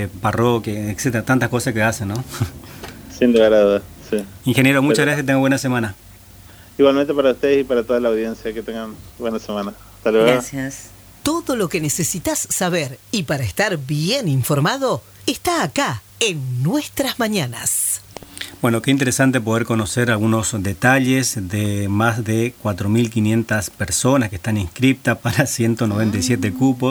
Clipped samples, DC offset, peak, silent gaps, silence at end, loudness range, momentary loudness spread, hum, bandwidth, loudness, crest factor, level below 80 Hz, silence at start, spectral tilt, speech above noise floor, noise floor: under 0.1%; under 0.1%; 0 dBFS; none; 0 s; 3 LU; 11 LU; none; over 20 kHz; -19 LUFS; 18 dB; -46 dBFS; 0 s; -5 dB/octave; 24 dB; -42 dBFS